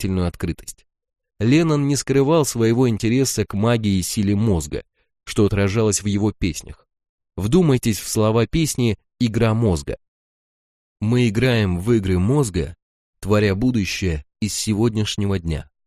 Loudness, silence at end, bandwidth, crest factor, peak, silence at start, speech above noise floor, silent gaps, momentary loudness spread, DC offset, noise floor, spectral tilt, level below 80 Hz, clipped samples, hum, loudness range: -20 LUFS; 0.25 s; 15.5 kHz; 16 dB; -4 dBFS; 0 s; over 71 dB; 7.09-7.18 s, 10.08-10.96 s, 12.82-13.13 s; 10 LU; under 0.1%; under -90 dBFS; -5.5 dB/octave; -38 dBFS; under 0.1%; none; 3 LU